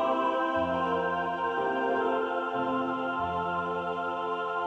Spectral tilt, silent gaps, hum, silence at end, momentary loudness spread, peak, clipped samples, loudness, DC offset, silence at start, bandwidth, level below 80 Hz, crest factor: -6.5 dB/octave; none; none; 0 s; 4 LU; -16 dBFS; under 0.1%; -29 LUFS; under 0.1%; 0 s; 8.6 kHz; -62 dBFS; 14 dB